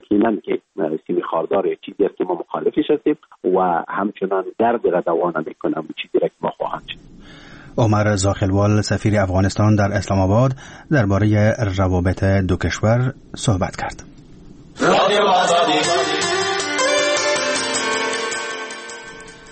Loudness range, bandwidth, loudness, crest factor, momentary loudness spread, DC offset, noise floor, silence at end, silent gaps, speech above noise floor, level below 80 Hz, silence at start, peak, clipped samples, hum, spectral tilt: 4 LU; 8.8 kHz; -19 LUFS; 16 dB; 10 LU; under 0.1%; -41 dBFS; 0 s; none; 23 dB; -44 dBFS; 0.1 s; -2 dBFS; under 0.1%; none; -5 dB/octave